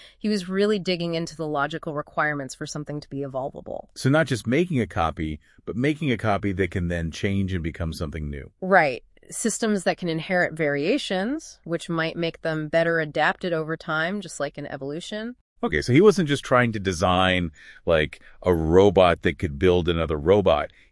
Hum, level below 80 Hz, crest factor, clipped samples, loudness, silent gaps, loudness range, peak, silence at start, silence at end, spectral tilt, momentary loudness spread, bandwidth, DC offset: none; -46 dBFS; 20 dB; under 0.1%; -24 LUFS; 15.41-15.56 s; 6 LU; -2 dBFS; 0 s; 0.25 s; -5.5 dB/octave; 13 LU; 12 kHz; under 0.1%